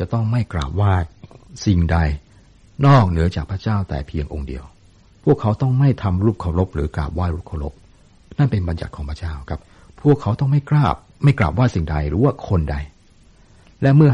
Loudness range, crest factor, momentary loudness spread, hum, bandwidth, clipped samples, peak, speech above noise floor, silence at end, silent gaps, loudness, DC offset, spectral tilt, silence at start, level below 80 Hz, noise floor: 4 LU; 16 dB; 13 LU; none; 8 kHz; under 0.1%; -4 dBFS; 32 dB; 0 s; none; -19 LUFS; under 0.1%; -8.5 dB/octave; 0 s; -32 dBFS; -50 dBFS